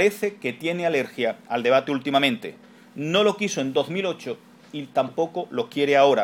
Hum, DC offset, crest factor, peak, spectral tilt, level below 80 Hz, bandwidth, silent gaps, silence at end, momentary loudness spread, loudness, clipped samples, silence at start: none; under 0.1%; 20 dB; -4 dBFS; -4.5 dB/octave; -74 dBFS; 17 kHz; none; 0 s; 13 LU; -23 LUFS; under 0.1%; 0 s